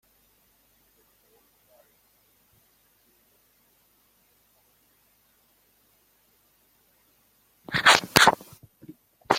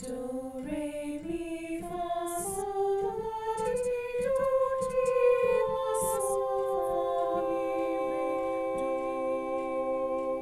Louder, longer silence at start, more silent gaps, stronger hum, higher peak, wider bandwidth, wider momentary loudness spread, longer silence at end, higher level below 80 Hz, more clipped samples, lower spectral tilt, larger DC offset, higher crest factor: first, -19 LUFS vs -31 LUFS; first, 7.7 s vs 0 s; neither; neither; first, 0 dBFS vs -16 dBFS; first, 16.5 kHz vs 14.5 kHz; first, 14 LU vs 9 LU; about the same, 0 s vs 0 s; second, -64 dBFS vs -56 dBFS; neither; second, -1.5 dB/octave vs -4.5 dB/octave; neither; first, 30 dB vs 16 dB